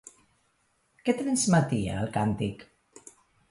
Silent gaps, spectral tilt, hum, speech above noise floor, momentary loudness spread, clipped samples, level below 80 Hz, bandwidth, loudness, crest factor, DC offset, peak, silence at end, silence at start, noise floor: none; -5.5 dB/octave; none; 44 dB; 10 LU; under 0.1%; -54 dBFS; 11.5 kHz; -27 LUFS; 20 dB; under 0.1%; -10 dBFS; 0.85 s; 1.05 s; -71 dBFS